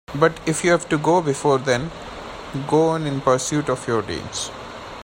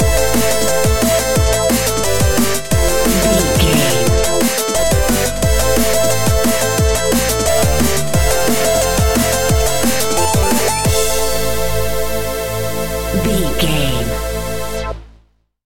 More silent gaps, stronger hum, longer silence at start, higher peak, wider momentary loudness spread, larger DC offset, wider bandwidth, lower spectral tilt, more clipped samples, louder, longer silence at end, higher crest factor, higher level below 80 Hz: neither; neither; about the same, 0.1 s vs 0 s; about the same, -2 dBFS vs 0 dBFS; first, 14 LU vs 7 LU; second, under 0.1% vs 6%; about the same, 16 kHz vs 17 kHz; about the same, -5 dB/octave vs -4 dB/octave; neither; second, -21 LUFS vs -15 LUFS; about the same, 0 s vs 0 s; about the same, 18 dB vs 14 dB; second, -48 dBFS vs -22 dBFS